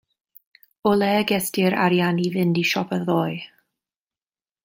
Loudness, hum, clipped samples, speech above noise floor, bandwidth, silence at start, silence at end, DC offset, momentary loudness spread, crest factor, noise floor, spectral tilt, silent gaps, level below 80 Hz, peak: -21 LUFS; none; under 0.1%; over 69 dB; 16.5 kHz; 0.85 s; 1.2 s; under 0.1%; 7 LU; 18 dB; under -90 dBFS; -5.5 dB/octave; none; -62 dBFS; -6 dBFS